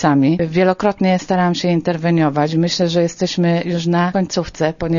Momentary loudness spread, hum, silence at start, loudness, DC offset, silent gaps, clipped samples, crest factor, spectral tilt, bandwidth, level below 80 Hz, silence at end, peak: 4 LU; none; 0 s; -17 LUFS; under 0.1%; none; under 0.1%; 14 dB; -6 dB/octave; 7.4 kHz; -46 dBFS; 0 s; -2 dBFS